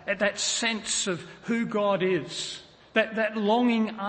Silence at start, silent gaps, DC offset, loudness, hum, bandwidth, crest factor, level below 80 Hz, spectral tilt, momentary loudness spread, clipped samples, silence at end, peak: 0 s; none; under 0.1%; -26 LUFS; none; 8.8 kHz; 20 dB; -66 dBFS; -3 dB/octave; 9 LU; under 0.1%; 0 s; -8 dBFS